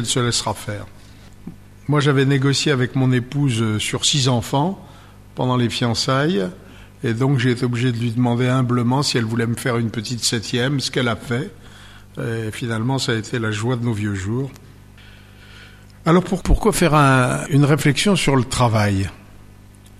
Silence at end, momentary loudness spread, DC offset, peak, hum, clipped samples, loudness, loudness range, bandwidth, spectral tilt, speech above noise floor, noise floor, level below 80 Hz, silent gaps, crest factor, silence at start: 0.05 s; 11 LU; under 0.1%; -4 dBFS; 50 Hz at -45 dBFS; under 0.1%; -19 LUFS; 7 LU; 14 kHz; -5 dB/octave; 25 dB; -43 dBFS; -36 dBFS; none; 16 dB; 0 s